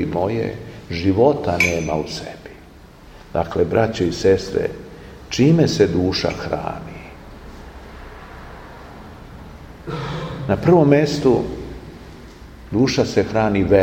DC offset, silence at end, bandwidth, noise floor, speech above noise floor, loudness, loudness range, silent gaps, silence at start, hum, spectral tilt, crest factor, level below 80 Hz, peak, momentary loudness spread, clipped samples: under 0.1%; 0 s; 16 kHz; -43 dBFS; 26 dB; -19 LUFS; 14 LU; none; 0 s; none; -6 dB/octave; 20 dB; -40 dBFS; 0 dBFS; 24 LU; under 0.1%